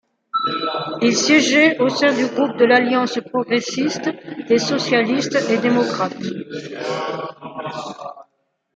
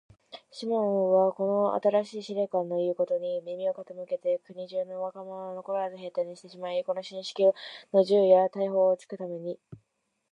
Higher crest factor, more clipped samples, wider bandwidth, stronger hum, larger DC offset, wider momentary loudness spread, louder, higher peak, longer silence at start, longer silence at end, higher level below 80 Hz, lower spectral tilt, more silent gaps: about the same, 18 dB vs 20 dB; neither; about the same, 9.2 kHz vs 9.6 kHz; neither; neither; about the same, 16 LU vs 15 LU; first, -18 LUFS vs -28 LUFS; first, -2 dBFS vs -8 dBFS; about the same, 0.35 s vs 0.35 s; about the same, 0.5 s vs 0.55 s; first, -68 dBFS vs -80 dBFS; second, -3.5 dB/octave vs -6.5 dB/octave; neither